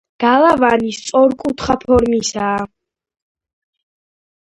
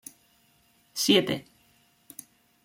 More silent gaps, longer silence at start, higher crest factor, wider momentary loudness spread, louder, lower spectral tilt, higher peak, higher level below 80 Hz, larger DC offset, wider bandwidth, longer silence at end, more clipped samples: neither; second, 0.2 s vs 0.95 s; second, 16 dB vs 24 dB; second, 9 LU vs 24 LU; first, -15 LUFS vs -25 LUFS; about the same, -4.5 dB/octave vs -3.5 dB/octave; first, 0 dBFS vs -8 dBFS; first, -40 dBFS vs -70 dBFS; neither; second, 11 kHz vs 16.5 kHz; first, 1.75 s vs 1.25 s; neither